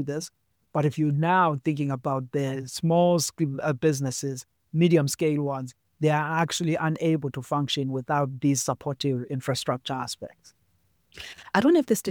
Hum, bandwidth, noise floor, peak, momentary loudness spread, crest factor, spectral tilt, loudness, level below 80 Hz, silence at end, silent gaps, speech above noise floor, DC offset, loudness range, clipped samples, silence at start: none; 19.5 kHz; -69 dBFS; -6 dBFS; 13 LU; 20 dB; -5.5 dB/octave; -26 LUFS; -66 dBFS; 0 s; none; 43 dB; under 0.1%; 4 LU; under 0.1%; 0 s